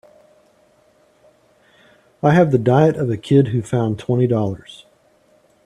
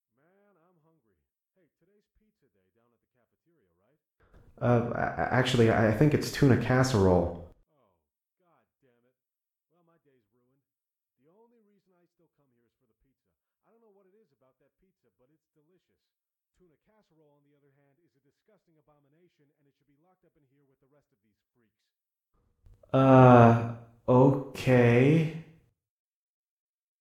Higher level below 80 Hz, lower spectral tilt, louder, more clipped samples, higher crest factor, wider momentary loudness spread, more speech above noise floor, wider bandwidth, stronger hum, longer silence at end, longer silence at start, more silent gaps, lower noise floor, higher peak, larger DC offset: about the same, -54 dBFS vs -56 dBFS; about the same, -8.5 dB/octave vs -7.5 dB/octave; first, -17 LUFS vs -23 LUFS; neither; second, 18 dB vs 24 dB; second, 8 LU vs 15 LU; second, 40 dB vs over 66 dB; second, 11 kHz vs 13.5 kHz; neither; second, 0.9 s vs 1.6 s; second, 2.25 s vs 4.6 s; neither; second, -56 dBFS vs under -90 dBFS; first, -2 dBFS vs -6 dBFS; neither